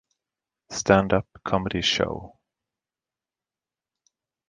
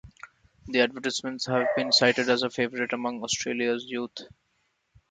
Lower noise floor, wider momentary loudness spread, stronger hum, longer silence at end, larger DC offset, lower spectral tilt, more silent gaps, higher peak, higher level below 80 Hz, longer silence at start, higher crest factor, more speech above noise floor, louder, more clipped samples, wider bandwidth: first, under -90 dBFS vs -73 dBFS; about the same, 11 LU vs 11 LU; neither; first, 2.2 s vs 0.85 s; neither; first, -4.5 dB/octave vs -3 dB/octave; neither; first, -2 dBFS vs -6 dBFS; first, -50 dBFS vs -62 dBFS; first, 0.7 s vs 0.05 s; about the same, 26 dB vs 22 dB; first, over 67 dB vs 47 dB; about the same, -24 LUFS vs -26 LUFS; neither; about the same, 9.8 kHz vs 9.4 kHz